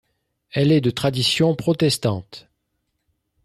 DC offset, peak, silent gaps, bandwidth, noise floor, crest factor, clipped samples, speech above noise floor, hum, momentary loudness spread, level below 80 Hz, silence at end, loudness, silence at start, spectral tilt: under 0.1%; -8 dBFS; none; 13.5 kHz; -74 dBFS; 14 dB; under 0.1%; 55 dB; none; 8 LU; -56 dBFS; 1.05 s; -20 LUFS; 0.55 s; -5.5 dB/octave